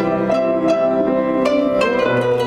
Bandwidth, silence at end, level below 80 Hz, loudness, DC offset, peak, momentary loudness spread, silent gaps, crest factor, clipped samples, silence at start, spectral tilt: 11 kHz; 0 s; -48 dBFS; -17 LUFS; under 0.1%; -4 dBFS; 1 LU; none; 12 dB; under 0.1%; 0 s; -6.5 dB/octave